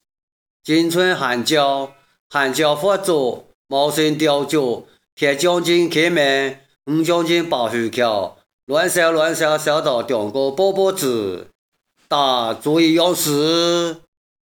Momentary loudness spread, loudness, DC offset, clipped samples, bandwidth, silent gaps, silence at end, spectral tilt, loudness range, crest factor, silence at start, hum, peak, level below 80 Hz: 9 LU; -18 LUFS; under 0.1%; under 0.1%; over 20 kHz; 2.20-2.30 s, 3.54-3.65 s, 5.12-5.17 s, 8.53-8.67 s, 11.55-11.72 s; 0.45 s; -4 dB/octave; 1 LU; 16 dB; 0.65 s; none; -2 dBFS; -68 dBFS